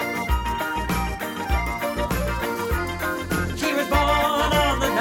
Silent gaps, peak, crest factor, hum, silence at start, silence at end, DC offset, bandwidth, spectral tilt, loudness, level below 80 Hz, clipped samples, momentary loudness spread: none; -6 dBFS; 16 dB; none; 0 s; 0 s; under 0.1%; 17.5 kHz; -4.5 dB/octave; -23 LUFS; -30 dBFS; under 0.1%; 6 LU